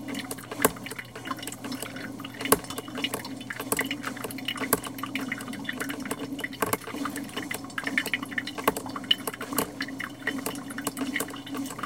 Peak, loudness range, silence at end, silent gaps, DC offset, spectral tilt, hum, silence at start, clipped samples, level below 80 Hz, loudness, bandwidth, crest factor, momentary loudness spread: 0 dBFS; 2 LU; 0 s; none; under 0.1%; -2.5 dB/octave; none; 0 s; under 0.1%; -60 dBFS; -31 LUFS; 17 kHz; 32 dB; 9 LU